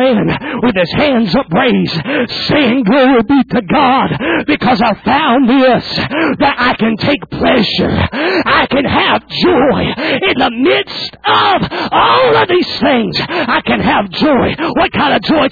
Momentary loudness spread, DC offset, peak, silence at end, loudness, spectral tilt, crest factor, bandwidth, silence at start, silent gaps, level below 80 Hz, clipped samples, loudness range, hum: 5 LU; under 0.1%; 0 dBFS; 0 s; -11 LUFS; -7 dB/octave; 12 dB; 5 kHz; 0 s; none; -38 dBFS; under 0.1%; 1 LU; none